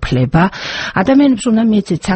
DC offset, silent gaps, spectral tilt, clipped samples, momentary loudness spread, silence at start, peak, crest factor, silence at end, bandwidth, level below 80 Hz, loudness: under 0.1%; none; -6.5 dB/octave; under 0.1%; 6 LU; 0 s; 0 dBFS; 12 dB; 0 s; 8.8 kHz; -32 dBFS; -13 LUFS